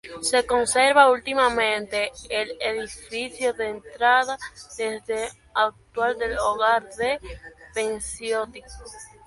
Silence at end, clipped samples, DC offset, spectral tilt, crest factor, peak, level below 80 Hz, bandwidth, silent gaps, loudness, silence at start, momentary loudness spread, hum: 0.2 s; under 0.1%; under 0.1%; -1.5 dB/octave; 22 dB; -2 dBFS; -50 dBFS; 11.5 kHz; none; -23 LUFS; 0.05 s; 15 LU; none